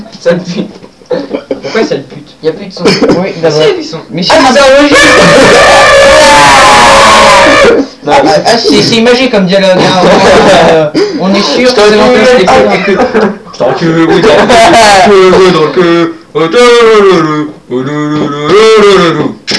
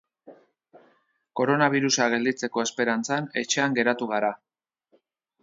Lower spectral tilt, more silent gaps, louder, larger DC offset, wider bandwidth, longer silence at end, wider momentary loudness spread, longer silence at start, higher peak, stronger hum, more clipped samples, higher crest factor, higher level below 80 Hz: about the same, -4 dB/octave vs -3.5 dB/octave; neither; first, -4 LUFS vs -24 LUFS; first, 0.8% vs under 0.1%; first, 11 kHz vs 7.8 kHz; second, 0 s vs 1.05 s; first, 13 LU vs 7 LU; second, 0 s vs 0.25 s; first, 0 dBFS vs -6 dBFS; neither; first, 10% vs under 0.1%; second, 4 dB vs 20 dB; first, -32 dBFS vs -76 dBFS